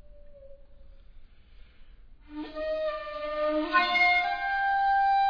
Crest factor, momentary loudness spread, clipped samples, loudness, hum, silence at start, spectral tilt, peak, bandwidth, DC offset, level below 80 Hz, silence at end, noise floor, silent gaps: 20 dB; 15 LU; under 0.1%; -26 LUFS; none; 0.1 s; -4 dB/octave; -10 dBFS; 5.4 kHz; under 0.1%; -52 dBFS; 0 s; -51 dBFS; none